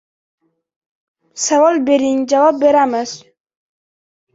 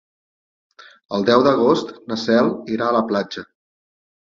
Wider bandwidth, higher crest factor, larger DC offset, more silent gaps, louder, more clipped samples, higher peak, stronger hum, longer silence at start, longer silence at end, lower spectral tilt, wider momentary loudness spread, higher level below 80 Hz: about the same, 8 kHz vs 7.4 kHz; about the same, 16 dB vs 18 dB; neither; neither; first, -14 LUFS vs -18 LUFS; neither; about the same, -2 dBFS vs -2 dBFS; neither; first, 1.35 s vs 1.1 s; first, 1.2 s vs 0.8 s; second, -2.5 dB/octave vs -6 dB/octave; first, 15 LU vs 12 LU; about the same, -64 dBFS vs -60 dBFS